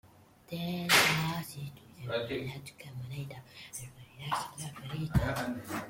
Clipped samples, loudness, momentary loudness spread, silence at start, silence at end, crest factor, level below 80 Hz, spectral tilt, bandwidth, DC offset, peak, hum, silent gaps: under 0.1%; -32 LUFS; 21 LU; 0.05 s; 0 s; 24 dB; -52 dBFS; -3.5 dB/octave; 16.5 kHz; under 0.1%; -10 dBFS; none; none